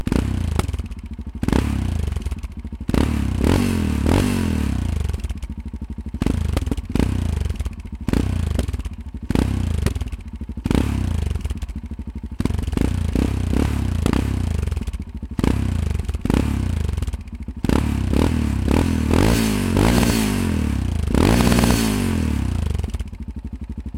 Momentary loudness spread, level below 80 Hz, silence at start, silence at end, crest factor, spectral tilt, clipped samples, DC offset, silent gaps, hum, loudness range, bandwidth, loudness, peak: 14 LU; -26 dBFS; 0 s; 0 s; 20 dB; -6 dB/octave; under 0.1%; under 0.1%; none; none; 6 LU; 16.5 kHz; -22 LUFS; -2 dBFS